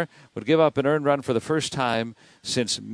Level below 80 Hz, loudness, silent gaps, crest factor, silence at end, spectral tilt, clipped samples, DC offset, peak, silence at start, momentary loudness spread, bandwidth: -62 dBFS; -24 LUFS; none; 18 dB; 0 s; -4.5 dB/octave; under 0.1%; under 0.1%; -6 dBFS; 0 s; 13 LU; 11 kHz